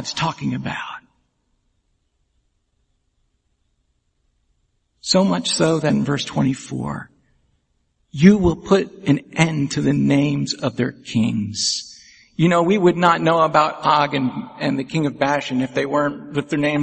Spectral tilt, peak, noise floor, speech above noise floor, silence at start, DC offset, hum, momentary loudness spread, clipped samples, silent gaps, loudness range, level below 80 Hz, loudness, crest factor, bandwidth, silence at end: -5.5 dB/octave; 0 dBFS; -68 dBFS; 49 dB; 0 s; under 0.1%; none; 12 LU; under 0.1%; none; 6 LU; -48 dBFS; -19 LUFS; 20 dB; 8.8 kHz; 0 s